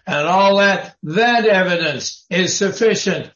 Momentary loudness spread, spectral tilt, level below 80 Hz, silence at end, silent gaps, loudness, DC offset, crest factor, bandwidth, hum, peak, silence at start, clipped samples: 8 LU; -3.5 dB/octave; -62 dBFS; 0.1 s; none; -16 LUFS; under 0.1%; 12 dB; 7.6 kHz; none; -4 dBFS; 0.05 s; under 0.1%